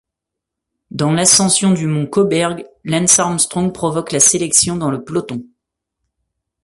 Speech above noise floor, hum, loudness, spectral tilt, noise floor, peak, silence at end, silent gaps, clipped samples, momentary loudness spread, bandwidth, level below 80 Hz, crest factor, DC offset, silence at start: 66 dB; none; -14 LUFS; -3.5 dB/octave; -81 dBFS; 0 dBFS; 1.2 s; none; under 0.1%; 12 LU; 12 kHz; -50 dBFS; 16 dB; under 0.1%; 0.95 s